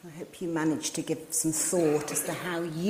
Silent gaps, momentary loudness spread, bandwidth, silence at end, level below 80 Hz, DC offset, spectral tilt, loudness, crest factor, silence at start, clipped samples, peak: none; 8 LU; 16 kHz; 0 s; -66 dBFS; under 0.1%; -4 dB/octave; -29 LUFS; 16 dB; 0.05 s; under 0.1%; -14 dBFS